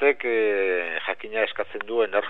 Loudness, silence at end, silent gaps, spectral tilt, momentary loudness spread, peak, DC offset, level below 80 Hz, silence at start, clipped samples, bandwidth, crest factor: -25 LUFS; 0 s; none; -5.5 dB/octave; 6 LU; -8 dBFS; 0.9%; -76 dBFS; 0 s; under 0.1%; 4.1 kHz; 16 dB